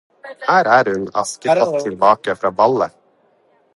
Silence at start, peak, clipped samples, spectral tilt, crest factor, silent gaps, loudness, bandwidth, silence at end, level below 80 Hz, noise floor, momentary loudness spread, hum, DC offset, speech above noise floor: 0.25 s; 0 dBFS; under 0.1%; -4.5 dB/octave; 18 dB; none; -16 LUFS; 11.5 kHz; 0.9 s; -60 dBFS; -57 dBFS; 8 LU; none; under 0.1%; 41 dB